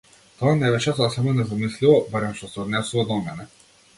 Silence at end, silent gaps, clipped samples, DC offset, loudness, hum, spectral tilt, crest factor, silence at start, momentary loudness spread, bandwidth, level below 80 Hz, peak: 0.5 s; none; under 0.1%; under 0.1%; -22 LUFS; none; -6 dB/octave; 18 dB; 0.4 s; 11 LU; 11.5 kHz; -54 dBFS; -4 dBFS